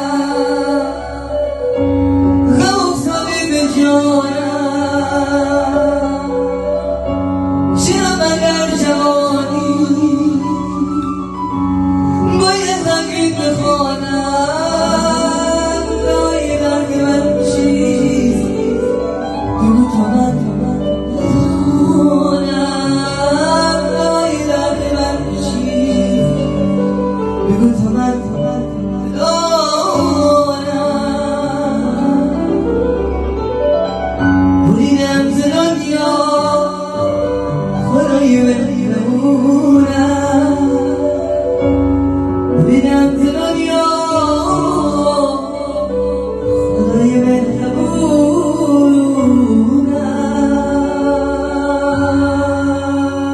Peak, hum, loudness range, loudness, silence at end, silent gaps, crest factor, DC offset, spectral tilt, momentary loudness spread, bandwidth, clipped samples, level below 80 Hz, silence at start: 0 dBFS; none; 3 LU; -14 LUFS; 0 s; none; 12 dB; under 0.1%; -5.5 dB/octave; 6 LU; 12 kHz; under 0.1%; -32 dBFS; 0 s